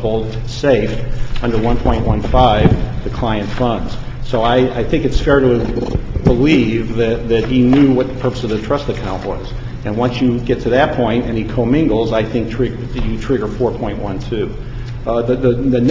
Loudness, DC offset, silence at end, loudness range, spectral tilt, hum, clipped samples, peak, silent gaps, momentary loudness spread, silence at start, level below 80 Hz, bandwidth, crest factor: -16 LUFS; under 0.1%; 0 s; 3 LU; -7.5 dB/octave; none; under 0.1%; 0 dBFS; none; 11 LU; 0 s; -24 dBFS; 7.6 kHz; 14 dB